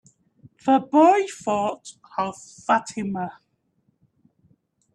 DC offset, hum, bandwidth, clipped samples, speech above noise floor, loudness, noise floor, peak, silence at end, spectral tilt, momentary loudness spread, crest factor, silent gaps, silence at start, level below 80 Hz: under 0.1%; none; 11 kHz; under 0.1%; 47 dB; -22 LUFS; -69 dBFS; -6 dBFS; 1.65 s; -5.5 dB/octave; 17 LU; 18 dB; none; 0.65 s; -68 dBFS